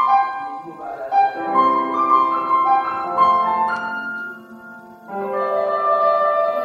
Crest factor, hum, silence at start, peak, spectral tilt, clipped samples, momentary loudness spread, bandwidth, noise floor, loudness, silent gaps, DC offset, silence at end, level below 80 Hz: 16 dB; none; 0 s; -4 dBFS; -6 dB/octave; under 0.1%; 16 LU; 13.5 kHz; -39 dBFS; -18 LUFS; none; under 0.1%; 0 s; -66 dBFS